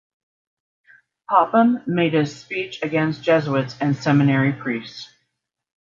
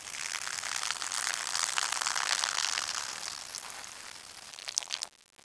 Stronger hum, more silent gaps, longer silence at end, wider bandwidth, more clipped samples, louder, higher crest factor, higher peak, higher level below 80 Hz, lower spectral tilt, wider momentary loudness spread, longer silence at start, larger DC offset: neither; neither; first, 0.75 s vs 0.25 s; second, 7.4 kHz vs 11 kHz; neither; first, -20 LUFS vs -32 LUFS; second, 20 dB vs 32 dB; about the same, -2 dBFS vs -4 dBFS; first, -64 dBFS vs -74 dBFS; first, -7.5 dB/octave vs 2.5 dB/octave; about the same, 11 LU vs 13 LU; first, 1.3 s vs 0 s; neither